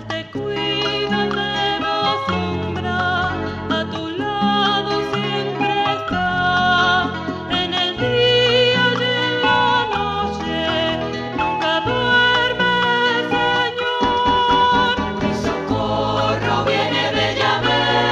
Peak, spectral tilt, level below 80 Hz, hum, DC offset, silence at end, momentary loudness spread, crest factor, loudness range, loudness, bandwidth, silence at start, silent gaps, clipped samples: -4 dBFS; -5 dB/octave; -42 dBFS; none; under 0.1%; 0 s; 8 LU; 14 dB; 4 LU; -18 LUFS; 10.5 kHz; 0 s; none; under 0.1%